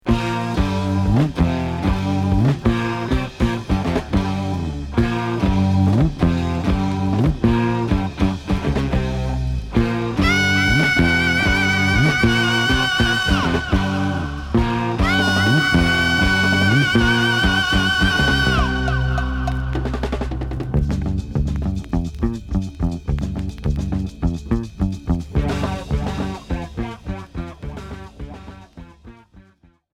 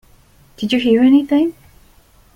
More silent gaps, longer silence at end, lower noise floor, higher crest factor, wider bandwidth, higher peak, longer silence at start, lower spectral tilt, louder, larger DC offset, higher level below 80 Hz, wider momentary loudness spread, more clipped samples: neither; second, 0.55 s vs 0.85 s; first, -54 dBFS vs -49 dBFS; about the same, 16 dB vs 14 dB; first, 16.5 kHz vs 11.5 kHz; about the same, -4 dBFS vs -2 dBFS; second, 0.05 s vs 0.6 s; about the same, -5.5 dB/octave vs -6 dB/octave; second, -19 LUFS vs -15 LUFS; neither; first, -28 dBFS vs -52 dBFS; about the same, 10 LU vs 10 LU; neither